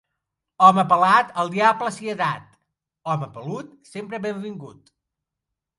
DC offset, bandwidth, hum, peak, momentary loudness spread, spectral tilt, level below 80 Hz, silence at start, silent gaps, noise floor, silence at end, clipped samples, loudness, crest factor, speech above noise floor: under 0.1%; 11.5 kHz; none; 0 dBFS; 19 LU; -5.5 dB/octave; -70 dBFS; 0.6 s; none; -84 dBFS; 1.1 s; under 0.1%; -20 LUFS; 22 dB; 63 dB